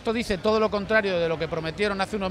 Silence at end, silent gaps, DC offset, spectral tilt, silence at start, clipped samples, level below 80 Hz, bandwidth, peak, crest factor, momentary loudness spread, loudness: 0 s; none; under 0.1%; -5.5 dB/octave; 0 s; under 0.1%; -46 dBFS; 14 kHz; -8 dBFS; 16 dB; 5 LU; -25 LUFS